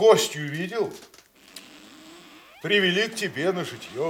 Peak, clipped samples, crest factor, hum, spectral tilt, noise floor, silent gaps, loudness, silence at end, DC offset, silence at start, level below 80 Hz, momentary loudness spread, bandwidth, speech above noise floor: -4 dBFS; under 0.1%; 22 dB; none; -3.5 dB/octave; -48 dBFS; none; -24 LUFS; 0 s; under 0.1%; 0 s; -72 dBFS; 26 LU; 17 kHz; 25 dB